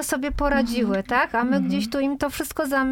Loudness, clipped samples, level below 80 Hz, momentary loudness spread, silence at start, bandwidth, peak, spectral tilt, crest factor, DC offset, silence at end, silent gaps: -23 LUFS; under 0.1%; -38 dBFS; 5 LU; 0 s; 17.5 kHz; -8 dBFS; -4.5 dB/octave; 16 dB; under 0.1%; 0 s; none